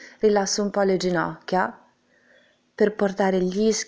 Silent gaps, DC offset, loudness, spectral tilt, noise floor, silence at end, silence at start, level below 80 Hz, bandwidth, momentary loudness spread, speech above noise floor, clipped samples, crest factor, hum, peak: none; under 0.1%; -23 LUFS; -4.5 dB/octave; -60 dBFS; 0.05 s; 0 s; -58 dBFS; 8 kHz; 4 LU; 38 dB; under 0.1%; 16 dB; none; -8 dBFS